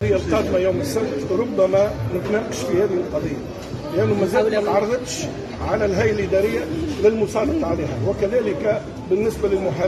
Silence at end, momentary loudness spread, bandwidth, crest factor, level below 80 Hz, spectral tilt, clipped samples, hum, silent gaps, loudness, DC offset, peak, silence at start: 0 s; 7 LU; 13.5 kHz; 16 dB; -40 dBFS; -6 dB/octave; under 0.1%; none; none; -21 LUFS; under 0.1%; -4 dBFS; 0 s